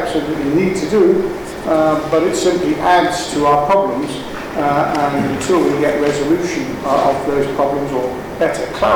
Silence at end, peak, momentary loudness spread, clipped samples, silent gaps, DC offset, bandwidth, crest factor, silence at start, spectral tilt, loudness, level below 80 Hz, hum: 0 s; -2 dBFS; 7 LU; under 0.1%; none; under 0.1%; over 20 kHz; 14 dB; 0 s; -5 dB/octave; -16 LUFS; -40 dBFS; none